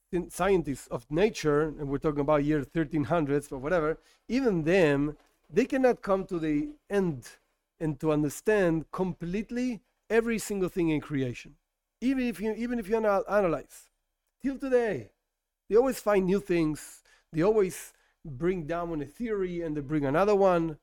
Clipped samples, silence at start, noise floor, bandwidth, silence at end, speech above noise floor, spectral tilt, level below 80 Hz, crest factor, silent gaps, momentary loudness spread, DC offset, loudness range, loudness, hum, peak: under 0.1%; 0.1 s; -84 dBFS; 17 kHz; 0.05 s; 56 dB; -6.5 dB/octave; -52 dBFS; 16 dB; none; 10 LU; under 0.1%; 3 LU; -28 LUFS; none; -12 dBFS